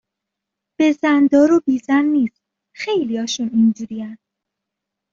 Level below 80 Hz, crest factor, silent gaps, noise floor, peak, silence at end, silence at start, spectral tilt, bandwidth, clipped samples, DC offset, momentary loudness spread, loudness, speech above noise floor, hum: -62 dBFS; 16 dB; none; -82 dBFS; -4 dBFS; 0.95 s; 0.8 s; -5 dB/octave; 7.6 kHz; under 0.1%; under 0.1%; 15 LU; -17 LUFS; 66 dB; none